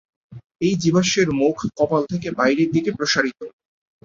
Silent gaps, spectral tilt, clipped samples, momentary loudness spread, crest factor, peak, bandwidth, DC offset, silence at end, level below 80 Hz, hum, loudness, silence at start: 0.46-0.50 s; -5 dB/octave; under 0.1%; 8 LU; 18 dB; -4 dBFS; 7.8 kHz; under 0.1%; 0.55 s; -54 dBFS; none; -20 LUFS; 0.3 s